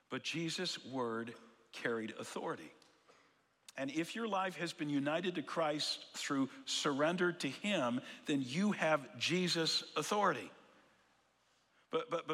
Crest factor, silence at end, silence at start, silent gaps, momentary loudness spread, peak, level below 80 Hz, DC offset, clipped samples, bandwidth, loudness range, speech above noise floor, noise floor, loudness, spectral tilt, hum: 20 dB; 0 s; 0.1 s; none; 10 LU; -20 dBFS; -90 dBFS; under 0.1%; under 0.1%; 15.5 kHz; 7 LU; 37 dB; -75 dBFS; -37 LUFS; -4 dB/octave; none